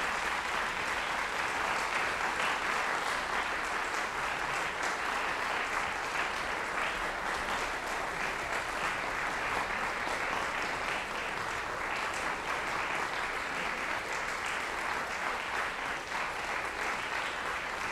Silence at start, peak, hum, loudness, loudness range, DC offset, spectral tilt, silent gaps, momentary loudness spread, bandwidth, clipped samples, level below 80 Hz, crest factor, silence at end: 0 s; -18 dBFS; none; -33 LUFS; 2 LU; under 0.1%; -2 dB/octave; none; 3 LU; 16 kHz; under 0.1%; -56 dBFS; 16 dB; 0 s